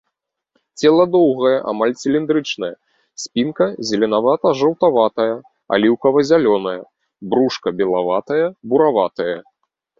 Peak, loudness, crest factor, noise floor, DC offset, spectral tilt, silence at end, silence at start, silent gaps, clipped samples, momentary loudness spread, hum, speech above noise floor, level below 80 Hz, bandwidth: -2 dBFS; -17 LUFS; 16 dB; -77 dBFS; under 0.1%; -5.5 dB/octave; 0.6 s; 0.75 s; none; under 0.1%; 10 LU; none; 60 dB; -60 dBFS; 7.8 kHz